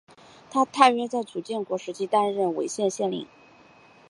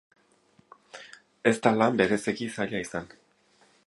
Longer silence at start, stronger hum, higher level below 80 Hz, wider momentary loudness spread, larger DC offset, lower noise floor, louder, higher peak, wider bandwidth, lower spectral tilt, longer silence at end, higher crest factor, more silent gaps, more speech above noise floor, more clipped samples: second, 0.5 s vs 0.95 s; neither; second, -76 dBFS vs -64 dBFS; second, 12 LU vs 24 LU; neither; second, -54 dBFS vs -64 dBFS; about the same, -25 LUFS vs -26 LUFS; about the same, -2 dBFS vs -4 dBFS; about the same, 11.5 kHz vs 11.5 kHz; about the same, -4 dB/octave vs -5 dB/octave; about the same, 0.85 s vs 0.8 s; about the same, 24 dB vs 24 dB; neither; second, 29 dB vs 38 dB; neither